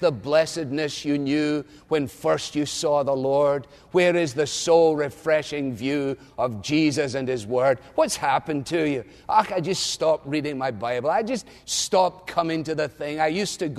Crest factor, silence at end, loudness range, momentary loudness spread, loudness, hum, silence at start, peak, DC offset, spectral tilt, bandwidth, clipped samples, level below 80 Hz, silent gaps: 18 dB; 0 s; 3 LU; 7 LU; -24 LUFS; none; 0 s; -6 dBFS; under 0.1%; -4.5 dB/octave; 13.5 kHz; under 0.1%; -58 dBFS; none